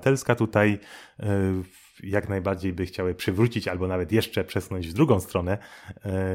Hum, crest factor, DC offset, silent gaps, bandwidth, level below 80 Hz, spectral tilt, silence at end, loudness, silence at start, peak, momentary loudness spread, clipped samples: none; 20 dB; under 0.1%; none; 16.5 kHz; -50 dBFS; -6.5 dB/octave; 0 s; -26 LUFS; 0 s; -6 dBFS; 11 LU; under 0.1%